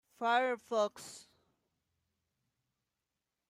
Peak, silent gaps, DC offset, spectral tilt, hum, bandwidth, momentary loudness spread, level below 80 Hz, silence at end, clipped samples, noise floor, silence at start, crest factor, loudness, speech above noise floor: -20 dBFS; none; under 0.1%; -2.5 dB/octave; none; 15.5 kHz; 19 LU; -90 dBFS; 2.3 s; under 0.1%; -89 dBFS; 0.2 s; 20 dB; -34 LUFS; 55 dB